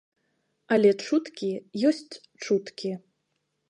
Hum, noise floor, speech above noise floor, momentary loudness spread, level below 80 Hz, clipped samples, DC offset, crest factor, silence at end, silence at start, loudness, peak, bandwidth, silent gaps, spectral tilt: none; -77 dBFS; 51 dB; 15 LU; -78 dBFS; under 0.1%; under 0.1%; 20 dB; 0.7 s; 0.7 s; -26 LUFS; -8 dBFS; 10.5 kHz; none; -5.5 dB/octave